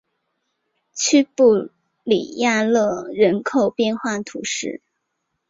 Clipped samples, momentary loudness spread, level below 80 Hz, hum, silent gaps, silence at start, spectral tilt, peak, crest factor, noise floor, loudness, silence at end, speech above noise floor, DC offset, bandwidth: under 0.1%; 14 LU; -64 dBFS; none; none; 0.95 s; -3.5 dB/octave; -4 dBFS; 16 dB; -75 dBFS; -19 LUFS; 0.75 s; 57 dB; under 0.1%; 7.8 kHz